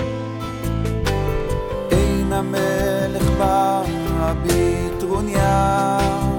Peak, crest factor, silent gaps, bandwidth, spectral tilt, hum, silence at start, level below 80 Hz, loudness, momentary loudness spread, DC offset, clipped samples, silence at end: -8 dBFS; 12 dB; none; over 20 kHz; -6 dB/octave; none; 0 s; -28 dBFS; -20 LUFS; 7 LU; under 0.1%; under 0.1%; 0 s